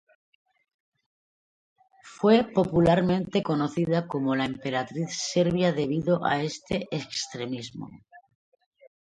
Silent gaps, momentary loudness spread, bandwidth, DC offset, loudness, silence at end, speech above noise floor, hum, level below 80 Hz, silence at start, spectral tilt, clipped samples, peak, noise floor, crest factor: none; 11 LU; 9.4 kHz; under 0.1%; -26 LUFS; 1 s; over 65 dB; none; -58 dBFS; 2.05 s; -5.5 dB/octave; under 0.1%; -6 dBFS; under -90 dBFS; 20 dB